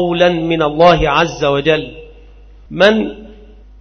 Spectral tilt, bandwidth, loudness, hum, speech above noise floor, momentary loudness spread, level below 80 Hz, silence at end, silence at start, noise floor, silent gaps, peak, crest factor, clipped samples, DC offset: -5.5 dB/octave; 6.6 kHz; -13 LUFS; none; 27 dB; 11 LU; -34 dBFS; 0.45 s; 0 s; -39 dBFS; none; 0 dBFS; 14 dB; under 0.1%; under 0.1%